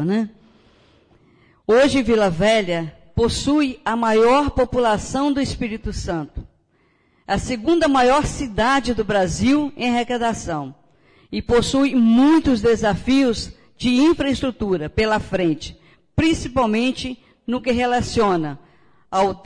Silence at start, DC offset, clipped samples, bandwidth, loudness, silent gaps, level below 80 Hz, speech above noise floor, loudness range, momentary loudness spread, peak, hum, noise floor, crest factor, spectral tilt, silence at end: 0 s; under 0.1%; under 0.1%; 10.5 kHz; -19 LUFS; none; -38 dBFS; 43 dB; 4 LU; 13 LU; -8 dBFS; none; -61 dBFS; 12 dB; -5.5 dB/octave; 0.05 s